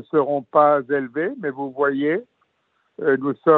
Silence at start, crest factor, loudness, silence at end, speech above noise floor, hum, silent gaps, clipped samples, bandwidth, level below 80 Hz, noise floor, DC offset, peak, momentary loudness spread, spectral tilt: 0.15 s; 18 dB; -21 LUFS; 0 s; 49 dB; none; none; under 0.1%; 4.1 kHz; -74 dBFS; -68 dBFS; under 0.1%; -2 dBFS; 10 LU; -5.5 dB/octave